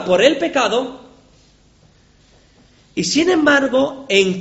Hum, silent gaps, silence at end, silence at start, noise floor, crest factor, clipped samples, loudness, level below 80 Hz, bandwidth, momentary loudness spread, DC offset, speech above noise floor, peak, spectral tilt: 50 Hz at -55 dBFS; none; 0 s; 0 s; -52 dBFS; 18 dB; under 0.1%; -16 LUFS; -54 dBFS; 8.2 kHz; 9 LU; under 0.1%; 36 dB; 0 dBFS; -3.5 dB/octave